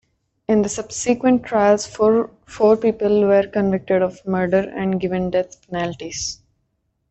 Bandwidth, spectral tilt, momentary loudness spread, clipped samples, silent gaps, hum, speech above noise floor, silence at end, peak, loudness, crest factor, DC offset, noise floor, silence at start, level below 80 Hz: 8.4 kHz; -5.5 dB/octave; 10 LU; under 0.1%; none; none; 52 dB; 0.75 s; -4 dBFS; -19 LUFS; 16 dB; under 0.1%; -70 dBFS; 0.5 s; -52 dBFS